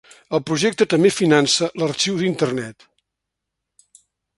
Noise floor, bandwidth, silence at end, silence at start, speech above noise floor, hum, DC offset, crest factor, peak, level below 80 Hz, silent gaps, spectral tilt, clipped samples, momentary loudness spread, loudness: -81 dBFS; 12 kHz; 1.65 s; 0.3 s; 63 dB; none; under 0.1%; 20 dB; 0 dBFS; -62 dBFS; none; -4 dB/octave; under 0.1%; 10 LU; -19 LUFS